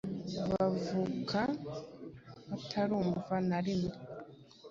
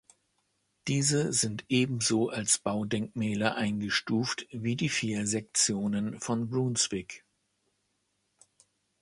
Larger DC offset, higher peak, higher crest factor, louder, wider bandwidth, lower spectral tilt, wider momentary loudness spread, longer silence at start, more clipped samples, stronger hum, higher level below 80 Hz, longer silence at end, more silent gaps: neither; second, -18 dBFS vs -10 dBFS; about the same, 18 dB vs 20 dB; second, -35 LUFS vs -29 LUFS; second, 7.6 kHz vs 11.5 kHz; first, -6 dB/octave vs -3.5 dB/octave; first, 17 LU vs 7 LU; second, 0.05 s vs 0.85 s; neither; neither; about the same, -62 dBFS vs -64 dBFS; second, 0 s vs 1.85 s; neither